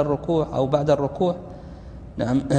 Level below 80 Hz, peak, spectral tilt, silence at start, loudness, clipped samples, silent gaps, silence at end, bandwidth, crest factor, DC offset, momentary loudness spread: -42 dBFS; -6 dBFS; -7.5 dB/octave; 0 s; -23 LUFS; under 0.1%; none; 0 s; 9.8 kHz; 18 dB; under 0.1%; 19 LU